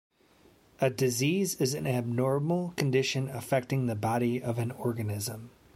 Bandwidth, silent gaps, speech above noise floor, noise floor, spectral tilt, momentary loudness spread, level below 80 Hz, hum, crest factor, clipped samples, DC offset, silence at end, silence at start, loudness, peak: 16.5 kHz; none; 32 dB; -62 dBFS; -5.5 dB/octave; 6 LU; -66 dBFS; none; 20 dB; under 0.1%; under 0.1%; 0.25 s; 0.8 s; -30 LUFS; -10 dBFS